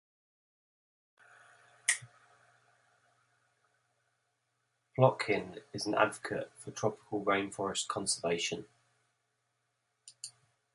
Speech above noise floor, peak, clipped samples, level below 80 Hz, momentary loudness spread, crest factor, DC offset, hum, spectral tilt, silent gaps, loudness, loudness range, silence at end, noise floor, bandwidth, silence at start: 48 dB; -10 dBFS; under 0.1%; -74 dBFS; 16 LU; 28 dB; under 0.1%; none; -3.5 dB/octave; none; -33 LUFS; 8 LU; 0.45 s; -81 dBFS; 11.5 kHz; 1.9 s